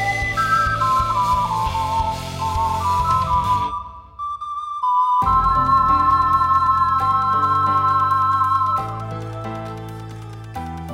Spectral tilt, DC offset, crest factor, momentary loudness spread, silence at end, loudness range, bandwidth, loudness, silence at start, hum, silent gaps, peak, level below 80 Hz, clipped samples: -5 dB/octave; under 0.1%; 14 dB; 15 LU; 0 s; 5 LU; 16 kHz; -18 LUFS; 0 s; none; none; -6 dBFS; -36 dBFS; under 0.1%